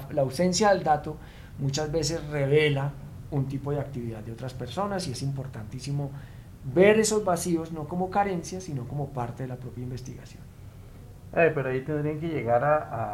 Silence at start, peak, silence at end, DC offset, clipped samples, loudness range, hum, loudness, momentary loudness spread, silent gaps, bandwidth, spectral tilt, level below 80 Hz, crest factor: 0 s; -6 dBFS; 0 s; under 0.1%; under 0.1%; 7 LU; none; -27 LUFS; 20 LU; none; 16 kHz; -5.5 dB/octave; -50 dBFS; 20 dB